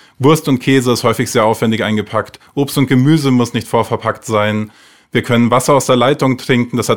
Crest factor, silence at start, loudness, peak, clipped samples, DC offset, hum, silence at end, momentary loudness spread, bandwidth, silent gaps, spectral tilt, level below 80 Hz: 14 dB; 0.2 s; -14 LUFS; 0 dBFS; under 0.1%; 0.6%; none; 0 s; 8 LU; 18.5 kHz; none; -5.5 dB/octave; -50 dBFS